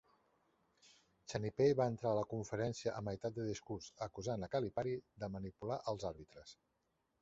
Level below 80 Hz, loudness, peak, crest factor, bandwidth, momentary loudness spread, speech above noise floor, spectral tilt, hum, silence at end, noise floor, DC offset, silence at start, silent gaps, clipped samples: -66 dBFS; -41 LUFS; -22 dBFS; 20 dB; 8 kHz; 13 LU; 37 dB; -6.5 dB/octave; none; 0.7 s; -78 dBFS; under 0.1%; 1.3 s; none; under 0.1%